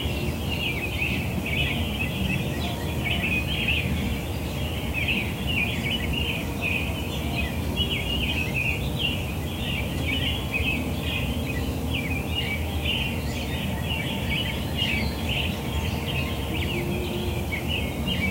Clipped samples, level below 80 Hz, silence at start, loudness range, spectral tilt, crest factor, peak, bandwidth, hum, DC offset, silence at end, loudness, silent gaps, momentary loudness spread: under 0.1%; -34 dBFS; 0 s; 1 LU; -5 dB/octave; 16 dB; -12 dBFS; 16 kHz; none; under 0.1%; 0 s; -26 LUFS; none; 4 LU